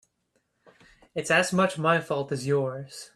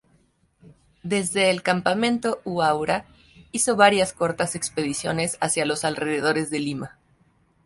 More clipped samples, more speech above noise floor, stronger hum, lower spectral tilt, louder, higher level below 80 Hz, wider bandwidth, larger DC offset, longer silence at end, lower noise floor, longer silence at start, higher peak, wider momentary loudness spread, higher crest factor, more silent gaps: neither; first, 48 dB vs 40 dB; neither; about the same, -4.5 dB/octave vs -3.5 dB/octave; about the same, -25 LUFS vs -23 LUFS; second, -66 dBFS vs -58 dBFS; first, 14.5 kHz vs 12 kHz; neither; second, 0.1 s vs 0.75 s; first, -74 dBFS vs -63 dBFS; first, 1.15 s vs 0.65 s; second, -8 dBFS vs -2 dBFS; about the same, 12 LU vs 10 LU; about the same, 20 dB vs 22 dB; neither